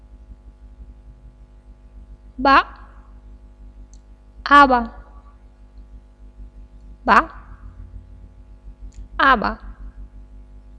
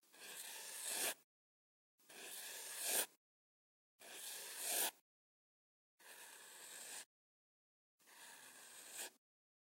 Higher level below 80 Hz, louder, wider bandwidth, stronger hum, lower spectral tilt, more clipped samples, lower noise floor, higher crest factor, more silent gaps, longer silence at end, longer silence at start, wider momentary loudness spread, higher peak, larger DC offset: first, -40 dBFS vs under -90 dBFS; first, -15 LUFS vs -45 LUFS; second, 11 kHz vs 16.5 kHz; first, 50 Hz at -40 dBFS vs none; first, -5 dB/octave vs 2 dB/octave; neither; second, -45 dBFS vs under -90 dBFS; about the same, 22 dB vs 26 dB; second, none vs 1.24-1.98 s, 3.17-3.99 s, 5.01-5.98 s, 7.06-7.99 s; first, 0.6 s vs 0.45 s; first, 0.3 s vs 0.1 s; first, 30 LU vs 21 LU; first, 0 dBFS vs -24 dBFS; neither